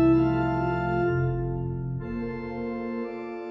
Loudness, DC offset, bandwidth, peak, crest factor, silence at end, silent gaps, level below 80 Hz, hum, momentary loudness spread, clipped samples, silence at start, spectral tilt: -28 LUFS; under 0.1%; 6 kHz; -12 dBFS; 16 dB; 0 s; none; -42 dBFS; none; 9 LU; under 0.1%; 0 s; -10.5 dB/octave